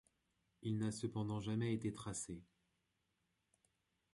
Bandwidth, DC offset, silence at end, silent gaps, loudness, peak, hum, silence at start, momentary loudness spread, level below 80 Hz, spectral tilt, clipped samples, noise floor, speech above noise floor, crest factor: 11.5 kHz; under 0.1%; 1.7 s; none; -43 LUFS; -28 dBFS; none; 0.6 s; 9 LU; -70 dBFS; -6 dB/octave; under 0.1%; -85 dBFS; 43 dB; 18 dB